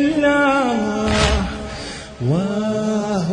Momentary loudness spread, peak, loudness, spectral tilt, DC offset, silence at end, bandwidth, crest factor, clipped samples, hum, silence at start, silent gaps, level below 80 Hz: 13 LU; -4 dBFS; -19 LUFS; -5.5 dB/octave; under 0.1%; 0 s; 10.5 kHz; 14 dB; under 0.1%; none; 0 s; none; -32 dBFS